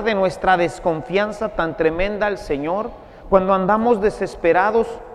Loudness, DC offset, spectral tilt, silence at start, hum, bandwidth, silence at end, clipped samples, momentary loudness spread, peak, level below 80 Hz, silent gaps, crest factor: -19 LUFS; under 0.1%; -6 dB/octave; 0 s; none; 11.5 kHz; 0 s; under 0.1%; 7 LU; 0 dBFS; -38 dBFS; none; 18 dB